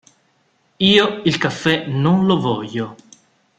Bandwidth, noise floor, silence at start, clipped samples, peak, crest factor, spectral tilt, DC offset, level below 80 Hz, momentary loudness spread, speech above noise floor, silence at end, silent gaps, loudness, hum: 8.8 kHz; -62 dBFS; 0.8 s; under 0.1%; -2 dBFS; 18 dB; -6 dB/octave; under 0.1%; -54 dBFS; 12 LU; 45 dB; 0.65 s; none; -17 LUFS; none